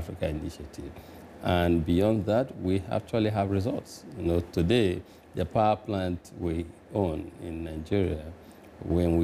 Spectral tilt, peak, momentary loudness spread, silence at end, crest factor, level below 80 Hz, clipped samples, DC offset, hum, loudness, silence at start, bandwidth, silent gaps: -7.5 dB/octave; -14 dBFS; 17 LU; 0 s; 16 dB; -46 dBFS; under 0.1%; under 0.1%; none; -29 LUFS; 0 s; 15 kHz; none